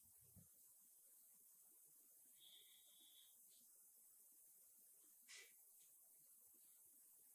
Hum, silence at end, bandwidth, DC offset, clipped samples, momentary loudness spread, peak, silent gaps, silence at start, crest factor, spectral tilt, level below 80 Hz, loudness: none; 0 s; 16 kHz; under 0.1%; under 0.1%; 4 LU; -50 dBFS; none; 0 s; 20 dB; 0 dB/octave; under -90 dBFS; -66 LUFS